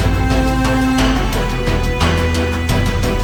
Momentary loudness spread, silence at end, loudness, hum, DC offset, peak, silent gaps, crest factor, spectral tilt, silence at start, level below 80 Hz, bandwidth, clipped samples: 3 LU; 0 s; -16 LUFS; none; under 0.1%; -2 dBFS; none; 12 dB; -5.5 dB/octave; 0 s; -20 dBFS; 20 kHz; under 0.1%